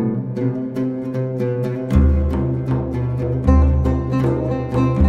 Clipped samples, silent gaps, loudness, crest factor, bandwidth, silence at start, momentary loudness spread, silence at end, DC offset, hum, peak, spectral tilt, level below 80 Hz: under 0.1%; none; -19 LUFS; 14 dB; 6.4 kHz; 0 s; 7 LU; 0 s; under 0.1%; none; -2 dBFS; -10 dB/octave; -22 dBFS